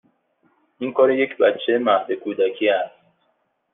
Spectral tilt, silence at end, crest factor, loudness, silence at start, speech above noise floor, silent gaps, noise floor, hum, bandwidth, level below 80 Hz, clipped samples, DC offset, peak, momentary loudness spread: -7.5 dB/octave; 0.85 s; 18 dB; -20 LUFS; 0.8 s; 49 dB; none; -69 dBFS; none; 3.9 kHz; -74 dBFS; under 0.1%; under 0.1%; -4 dBFS; 9 LU